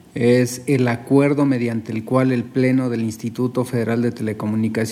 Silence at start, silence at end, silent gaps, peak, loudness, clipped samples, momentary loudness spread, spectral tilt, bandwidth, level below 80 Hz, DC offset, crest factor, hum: 0.15 s; 0 s; none; -4 dBFS; -19 LUFS; under 0.1%; 7 LU; -7 dB/octave; 15 kHz; -62 dBFS; under 0.1%; 16 dB; none